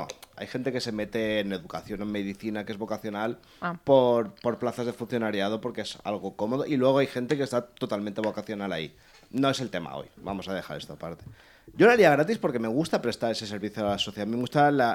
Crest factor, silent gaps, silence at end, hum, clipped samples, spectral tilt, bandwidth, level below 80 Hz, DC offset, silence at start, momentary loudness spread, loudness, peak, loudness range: 20 dB; none; 0 s; none; under 0.1%; -5.5 dB/octave; 17 kHz; -62 dBFS; under 0.1%; 0 s; 15 LU; -27 LUFS; -6 dBFS; 7 LU